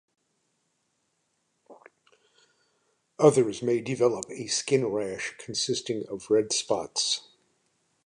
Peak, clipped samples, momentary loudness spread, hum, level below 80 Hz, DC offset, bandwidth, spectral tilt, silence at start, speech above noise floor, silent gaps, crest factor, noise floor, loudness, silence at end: -6 dBFS; under 0.1%; 11 LU; none; -70 dBFS; under 0.1%; 11 kHz; -3.5 dB/octave; 1.7 s; 49 dB; none; 24 dB; -75 dBFS; -27 LUFS; 0.85 s